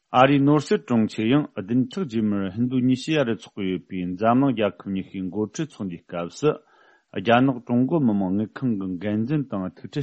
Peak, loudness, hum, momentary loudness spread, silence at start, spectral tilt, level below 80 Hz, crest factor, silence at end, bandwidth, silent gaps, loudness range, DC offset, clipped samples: -2 dBFS; -23 LUFS; none; 12 LU; 0.1 s; -7 dB/octave; -62 dBFS; 20 dB; 0 s; 8.4 kHz; none; 3 LU; under 0.1%; under 0.1%